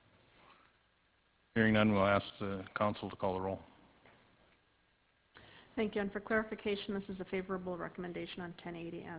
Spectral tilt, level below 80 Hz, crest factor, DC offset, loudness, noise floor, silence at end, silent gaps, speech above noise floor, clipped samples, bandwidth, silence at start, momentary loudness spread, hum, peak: -4.5 dB/octave; -62 dBFS; 22 dB; under 0.1%; -36 LUFS; -73 dBFS; 0 s; none; 37 dB; under 0.1%; 4 kHz; 1.55 s; 15 LU; none; -16 dBFS